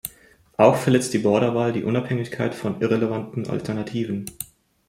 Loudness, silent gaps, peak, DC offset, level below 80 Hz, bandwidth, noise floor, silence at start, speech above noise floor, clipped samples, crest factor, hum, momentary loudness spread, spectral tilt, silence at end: -22 LUFS; none; -2 dBFS; under 0.1%; -58 dBFS; 16.5 kHz; -53 dBFS; 0.05 s; 31 dB; under 0.1%; 20 dB; none; 15 LU; -6 dB/octave; 0.45 s